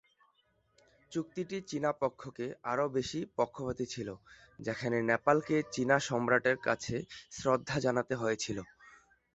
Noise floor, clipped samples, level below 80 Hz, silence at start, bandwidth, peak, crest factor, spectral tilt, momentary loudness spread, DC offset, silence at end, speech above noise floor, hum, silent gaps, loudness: -73 dBFS; under 0.1%; -64 dBFS; 1.1 s; 8.2 kHz; -12 dBFS; 22 dB; -5 dB/octave; 13 LU; under 0.1%; 0.4 s; 40 dB; none; none; -33 LUFS